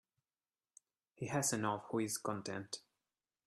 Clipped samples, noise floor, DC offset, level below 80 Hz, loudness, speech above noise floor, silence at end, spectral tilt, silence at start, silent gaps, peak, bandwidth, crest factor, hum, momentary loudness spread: under 0.1%; under -90 dBFS; under 0.1%; -78 dBFS; -40 LUFS; over 51 dB; 0.65 s; -4 dB/octave; 1.2 s; none; -22 dBFS; 14.5 kHz; 20 dB; none; 13 LU